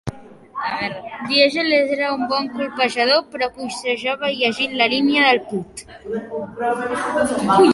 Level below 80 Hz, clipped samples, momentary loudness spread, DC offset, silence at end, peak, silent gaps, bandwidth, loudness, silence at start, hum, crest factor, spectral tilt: -54 dBFS; under 0.1%; 14 LU; under 0.1%; 0 s; -2 dBFS; none; 11.5 kHz; -19 LUFS; 0.05 s; none; 18 dB; -4 dB/octave